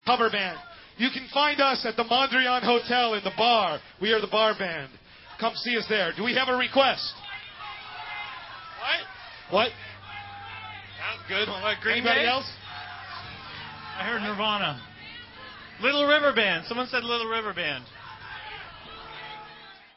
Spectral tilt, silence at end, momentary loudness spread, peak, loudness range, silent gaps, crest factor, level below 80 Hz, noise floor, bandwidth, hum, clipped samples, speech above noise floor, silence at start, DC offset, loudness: -7 dB/octave; 0.2 s; 19 LU; -6 dBFS; 8 LU; none; 22 dB; -60 dBFS; -48 dBFS; 5.8 kHz; none; under 0.1%; 23 dB; 0.05 s; under 0.1%; -25 LUFS